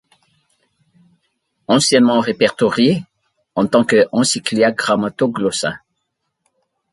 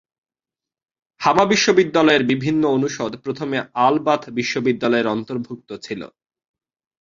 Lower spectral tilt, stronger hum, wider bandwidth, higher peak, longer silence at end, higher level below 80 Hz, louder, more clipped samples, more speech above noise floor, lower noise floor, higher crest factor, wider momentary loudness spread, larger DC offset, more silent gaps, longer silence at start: about the same, -4 dB/octave vs -4.5 dB/octave; neither; first, 11.5 kHz vs 7.6 kHz; about the same, 0 dBFS vs -2 dBFS; first, 1.15 s vs 0.95 s; about the same, -58 dBFS vs -60 dBFS; about the same, -16 LUFS vs -18 LUFS; neither; second, 58 dB vs 71 dB; second, -73 dBFS vs -90 dBFS; about the same, 18 dB vs 18 dB; second, 10 LU vs 16 LU; neither; neither; first, 1.7 s vs 1.2 s